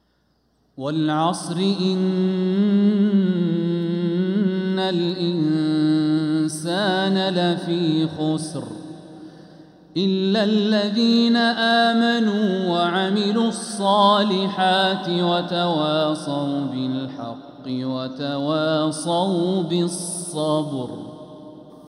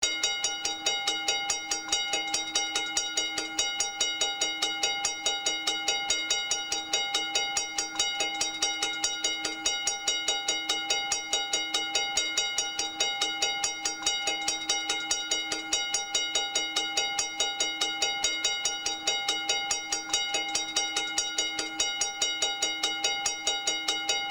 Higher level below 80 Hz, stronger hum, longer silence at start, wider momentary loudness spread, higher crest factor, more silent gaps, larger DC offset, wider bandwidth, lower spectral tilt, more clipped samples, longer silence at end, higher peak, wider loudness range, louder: second, -68 dBFS vs -62 dBFS; neither; first, 0.75 s vs 0 s; first, 12 LU vs 2 LU; about the same, 16 dB vs 18 dB; neither; neither; second, 12 kHz vs over 20 kHz; first, -5.5 dB/octave vs 1.5 dB/octave; neither; about the same, 0.05 s vs 0 s; first, -6 dBFS vs -12 dBFS; first, 5 LU vs 1 LU; first, -21 LUFS vs -27 LUFS